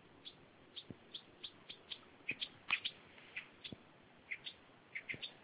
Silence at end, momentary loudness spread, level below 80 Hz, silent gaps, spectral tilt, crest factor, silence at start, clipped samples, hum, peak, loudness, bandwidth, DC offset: 0 s; 19 LU; -78 dBFS; none; 0.5 dB/octave; 26 dB; 0 s; under 0.1%; none; -22 dBFS; -46 LUFS; 4 kHz; under 0.1%